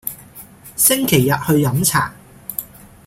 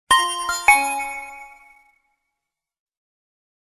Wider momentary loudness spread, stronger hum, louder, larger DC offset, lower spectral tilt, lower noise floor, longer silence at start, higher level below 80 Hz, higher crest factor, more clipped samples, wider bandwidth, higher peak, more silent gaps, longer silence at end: about the same, 19 LU vs 20 LU; neither; about the same, -16 LUFS vs -18 LUFS; neither; first, -4 dB/octave vs 1 dB/octave; second, -41 dBFS vs -83 dBFS; about the same, 0.05 s vs 0.1 s; first, -48 dBFS vs -56 dBFS; second, 18 dB vs 24 dB; neither; about the same, 16.5 kHz vs 15 kHz; about the same, 0 dBFS vs 0 dBFS; neither; second, 0.4 s vs 2.2 s